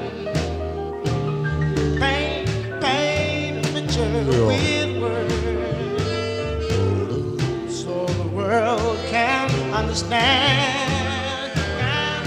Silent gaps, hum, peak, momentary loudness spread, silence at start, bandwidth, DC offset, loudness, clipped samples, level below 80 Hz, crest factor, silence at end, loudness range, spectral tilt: none; none; -4 dBFS; 7 LU; 0 s; 15 kHz; under 0.1%; -22 LUFS; under 0.1%; -36 dBFS; 18 dB; 0 s; 4 LU; -5 dB/octave